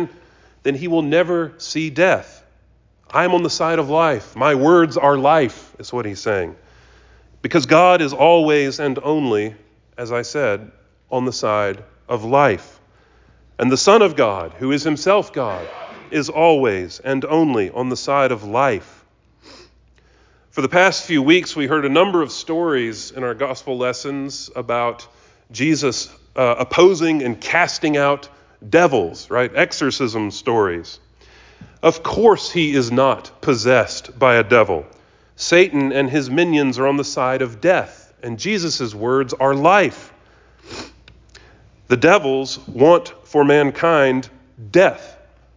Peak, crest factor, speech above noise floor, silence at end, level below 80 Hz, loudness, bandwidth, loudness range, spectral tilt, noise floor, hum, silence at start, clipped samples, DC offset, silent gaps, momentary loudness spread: -2 dBFS; 16 dB; 38 dB; 0.45 s; -52 dBFS; -17 LUFS; 7.6 kHz; 5 LU; -5 dB/octave; -54 dBFS; none; 0 s; under 0.1%; under 0.1%; none; 12 LU